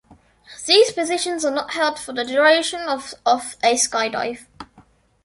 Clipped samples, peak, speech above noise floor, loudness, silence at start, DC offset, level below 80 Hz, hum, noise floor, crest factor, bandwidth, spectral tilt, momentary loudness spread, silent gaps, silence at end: under 0.1%; -2 dBFS; 34 dB; -19 LUFS; 0.5 s; under 0.1%; -60 dBFS; none; -54 dBFS; 20 dB; 11.5 kHz; -0.5 dB/octave; 12 LU; none; 0.6 s